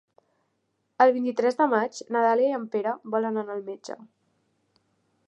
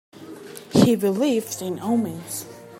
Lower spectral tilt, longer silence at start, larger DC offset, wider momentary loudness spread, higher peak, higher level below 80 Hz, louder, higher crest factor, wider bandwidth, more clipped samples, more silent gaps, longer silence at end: about the same, -5 dB/octave vs -5.5 dB/octave; first, 1 s vs 0.15 s; neither; second, 16 LU vs 21 LU; second, -6 dBFS vs -2 dBFS; second, -86 dBFS vs -60 dBFS; second, -25 LUFS vs -22 LUFS; about the same, 22 dB vs 20 dB; second, 8.4 kHz vs 16.5 kHz; neither; neither; first, 1.25 s vs 0 s